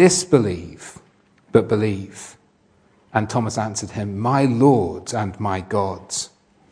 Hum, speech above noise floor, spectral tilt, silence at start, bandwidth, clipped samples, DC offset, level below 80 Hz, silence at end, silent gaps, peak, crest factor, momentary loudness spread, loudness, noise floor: none; 39 dB; -5.5 dB/octave; 0 s; 10.5 kHz; under 0.1%; under 0.1%; -54 dBFS; 0.45 s; none; 0 dBFS; 20 dB; 19 LU; -21 LUFS; -58 dBFS